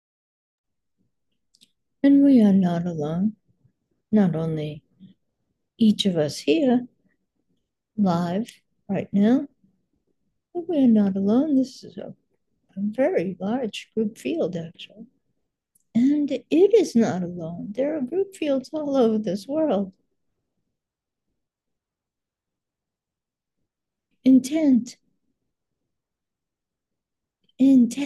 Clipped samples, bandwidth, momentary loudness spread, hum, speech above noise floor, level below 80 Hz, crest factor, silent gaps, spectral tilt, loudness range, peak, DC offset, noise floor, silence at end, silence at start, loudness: under 0.1%; 12 kHz; 17 LU; none; 67 dB; -68 dBFS; 18 dB; none; -7 dB/octave; 6 LU; -6 dBFS; under 0.1%; -87 dBFS; 0 s; 2.05 s; -22 LUFS